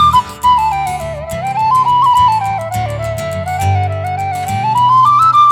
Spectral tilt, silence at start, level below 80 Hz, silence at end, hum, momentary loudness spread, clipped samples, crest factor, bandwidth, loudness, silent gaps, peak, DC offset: -5 dB/octave; 0 s; -36 dBFS; 0 s; none; 11 LU; under 0.1%; 12 dB; 18 kHz; -13 LUFS; none; 0 dBFS; under 0.1%